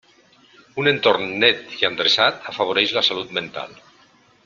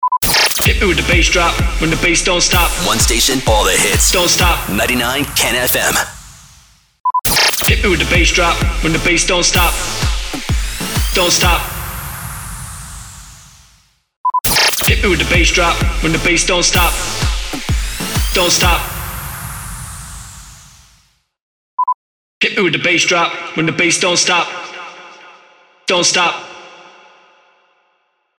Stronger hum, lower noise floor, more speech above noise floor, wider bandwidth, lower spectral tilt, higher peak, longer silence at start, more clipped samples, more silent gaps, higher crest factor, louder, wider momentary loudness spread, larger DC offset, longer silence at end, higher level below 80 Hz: neither; second, -55 dBFS vs -63 dBFS; second, 34 dB vs 50 dB; second, 12.5 kHz vs over 20 kHz; about the same, -3.5 dB/octave vs -2.5 dB/octave; about the same, -2 dBFS vs 0 dBFS; first, 0.75 s vs 0 s; neither; second, none vs 7.00-7.04 s, 14.17-14.24 s, 21.42-21.77 s, 21.94-22.41 s; first, 20 dB vs 14 dB; second, -18 LUFS vs -13 LUFS; about the same, 14 LU vs 15 LU; neither; second, 0.7 s vs 1.5 s; second, -62 dBFS vs -24 dBFS